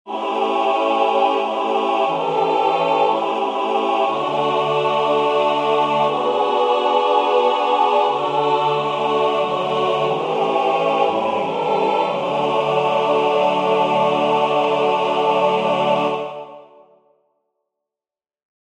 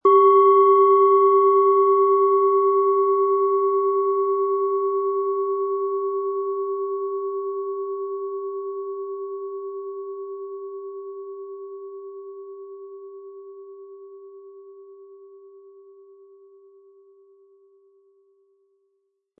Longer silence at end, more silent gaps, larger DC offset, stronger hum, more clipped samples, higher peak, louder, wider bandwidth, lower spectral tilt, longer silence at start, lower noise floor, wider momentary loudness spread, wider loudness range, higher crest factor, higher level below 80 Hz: second, 2.2 s vs 4.05 s; neither; neither; neither; neither; first, -2 dBFS vs -6 dBFS; about the same, -18 LUFS vs -20 LUFS; first, 10 kHz vs 3.4 kHz; second, -5 dB/octave vs -8 dB/octave; about the same, 0.05 s vs 0.05 s; first, under -90 dBFS vs -73 dBFS; second, 3 LU vs 24 LU; second, 2 LU vs 24 LU; about the same, 16 dB vs 16 dB; first, -68 dBFS vs -88 dBFS